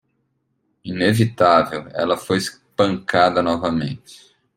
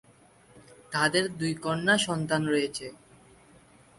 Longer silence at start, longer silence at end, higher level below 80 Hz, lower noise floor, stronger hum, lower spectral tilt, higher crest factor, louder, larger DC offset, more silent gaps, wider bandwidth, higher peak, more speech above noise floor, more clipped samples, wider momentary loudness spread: first, 0.85 s vs 0.55 s; second, 0.4 s vs 1.05 s; first, -56 dBFS vs -64 dBFS; first, -69 dBFS vs -58 dBFS; neither; first, -5.5 dB/octave vs -4 dB/octave; about the same, 20 dB vs 22 dB; first, -19 LUFS vs -27 LUFS; neither; neither; first, 16.5 kHz vs 11.5 kHz; first, -2 dBFS vs -8 dBFS; first, 51 dB vs 31 dB; neither; first, 13 LU vs 10 LU